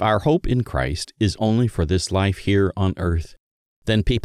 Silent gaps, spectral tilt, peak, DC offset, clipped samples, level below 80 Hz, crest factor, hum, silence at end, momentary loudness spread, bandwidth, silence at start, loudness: 3.40-3.82 s; -6 dB/octave; -6 dBFS; under 0.1%; under 0.1%; -32 dBFS; 14 dB; none; 0 s; 6 LU; 12.5 kHz; 0 s; -21 LUFS